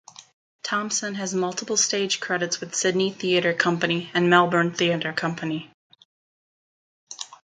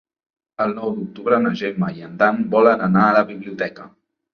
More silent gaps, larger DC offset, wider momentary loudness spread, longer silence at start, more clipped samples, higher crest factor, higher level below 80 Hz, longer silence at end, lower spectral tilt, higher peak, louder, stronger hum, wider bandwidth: first, 0.33-0.59 s, 5.74-5.90 s, 6.05-7.07 s vs none; neither; about the same, 13 LU vs 12 LU; second, 0.2 s vs 0.6 s; neither; about the same, 22 dB vs 18 dB; second, -72 dBFS vs -60 dBFS; second, 0.2 s vs 0.45 s; second, -3 dB/octave vs -8.5 dB/octave; about the same, -2 dBFS vs -2 dBFS; second, -23 LUFS vs -19 LUFS; neither; first, 9.6 kHz vs 6.6 kHz